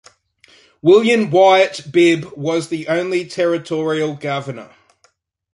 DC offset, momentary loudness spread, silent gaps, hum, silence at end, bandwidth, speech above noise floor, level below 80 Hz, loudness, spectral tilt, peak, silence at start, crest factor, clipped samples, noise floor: under 0.1%; 12 LU; none; none; 0.9 s; 11.5 kHz; 45 dB; -64 dBFS; -16 LUFS; -5.5 dB/octave; -2 dBFS; 0.85 s; 16 dB; under 0.1%; -60 dBFS